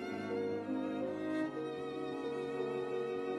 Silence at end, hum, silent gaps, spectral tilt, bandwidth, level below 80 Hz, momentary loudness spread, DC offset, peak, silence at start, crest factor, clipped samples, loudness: 0 s; none; none; -6.5 dB/octave; 12 kHz; -74 dBFS; 3 LU; under 0.1%; -26 dBFS; 0 s; 12 dB; under 0.1%; -39 LUFS